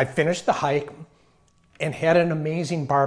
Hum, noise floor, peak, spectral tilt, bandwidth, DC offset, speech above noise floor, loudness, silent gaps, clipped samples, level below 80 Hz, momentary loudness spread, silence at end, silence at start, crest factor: none; -60 dBFS; -6 dBFS; -6 dB/octave; 10.5 kHz; under 0.1%; 38 dB; -23 LUFS; none; under 0.1%; -60 dBFS; 10 LU; 0 s; 0 s; 18 dB